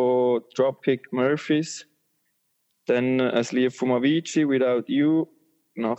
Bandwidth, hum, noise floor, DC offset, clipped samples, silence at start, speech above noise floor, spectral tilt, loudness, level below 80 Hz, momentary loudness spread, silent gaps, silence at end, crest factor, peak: 8.4 kHz; none; -73 dBFS; under 0.1%; under 0.1%; 0 s; 50 dB; -5.5 dB/octave; -23 LUFS; -82 dBFS; 10 LU; none; 0 s; 16 dB; -6 dBFS